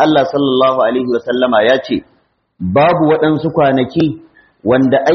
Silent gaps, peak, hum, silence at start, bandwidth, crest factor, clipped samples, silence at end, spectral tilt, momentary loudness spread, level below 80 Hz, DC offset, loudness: none; 0 dBFS; none; 0 s; 6.4 kHz; 12 dB; under 0.1%; 0 s; -4.5 dB/octave; 9 LU; -50 dBFS; under 0.1%; -13 LUFS